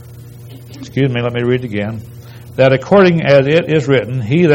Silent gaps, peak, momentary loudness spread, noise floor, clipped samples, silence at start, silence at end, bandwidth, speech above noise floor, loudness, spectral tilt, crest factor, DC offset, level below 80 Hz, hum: none; 0 dBFS; 18 LU; -34 dBFS; 0.2%; 0 s; 0 s; 16.5 kHz; 21 dB; -13 LUFS; -7.5 dB/octave; 14 dB; under 0.1%; -48 dBFS; 60 Hz at -35 dBFS